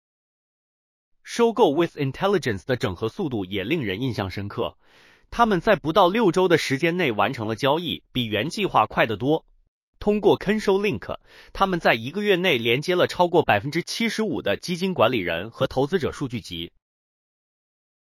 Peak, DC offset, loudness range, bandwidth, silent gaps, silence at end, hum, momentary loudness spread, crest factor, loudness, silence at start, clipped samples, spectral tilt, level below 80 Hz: -4 dBFS; under 0.1%; 4 LU; 16 kHz; 9.68-9.93 s; 1.45 s; none; 11 LU; 20 dB; -23 LUFS; 1.25 s; under 0.1%; -5.5 dB/octave; -50 dBFS